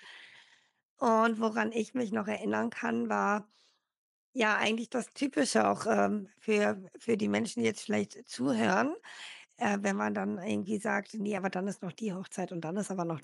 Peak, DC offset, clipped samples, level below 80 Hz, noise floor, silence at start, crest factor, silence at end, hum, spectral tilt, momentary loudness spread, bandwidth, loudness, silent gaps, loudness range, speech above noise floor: -14 dBFS; under 0.1%; under 0.1%; -88 dBFS; -61 dBFS; 0 s; 18 dB; 0 s; none; -5 dB/octave; 10 LU; 12 kHz; -32 LUFS; 0.83-0.97 s, 3.97-4.33 s; 3 LU; 30 dB